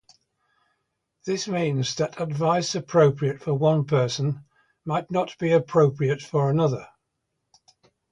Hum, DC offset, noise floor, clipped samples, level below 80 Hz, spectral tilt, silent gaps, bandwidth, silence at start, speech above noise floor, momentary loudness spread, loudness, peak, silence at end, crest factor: none; under 0.1%; -78 dBFS; under 0.1%; -62 dBFS; -6 dB/octave; none; 9.8 kHz; 1.25 s; 56 dB; 9 LU; -24 LUFS; -6 dBFS; 1.25 s; 18 dB